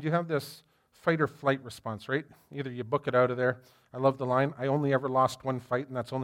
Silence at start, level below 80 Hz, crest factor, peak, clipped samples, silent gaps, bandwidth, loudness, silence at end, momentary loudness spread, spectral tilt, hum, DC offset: 0 s; -72 dBFS; 18 dB; -12 dBFS; under 0.1%; none; 16.5 kHz; -30 LUFS; 0 s; 13 LU; -7 dB/octave; none; under 0.1%